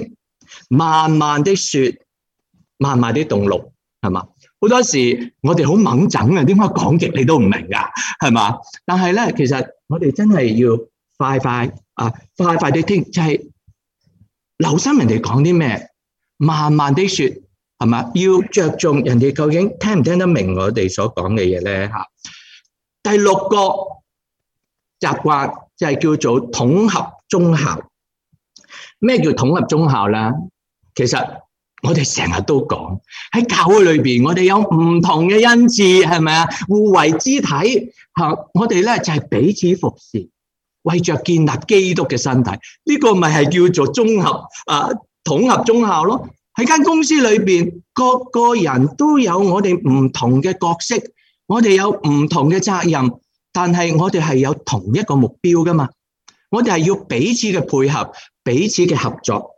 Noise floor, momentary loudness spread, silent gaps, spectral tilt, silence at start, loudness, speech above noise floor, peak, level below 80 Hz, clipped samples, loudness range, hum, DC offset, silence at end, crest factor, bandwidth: -80 dBFS; 9 LU; none; -5.5 dB/octave; 0 s; -15 LUFS; 65 dB; 0 dBFS; -52 dBFS; under 0.1%; 5 LU; none; under 0.1%; 0.1 s; 16 dB; 10 kHz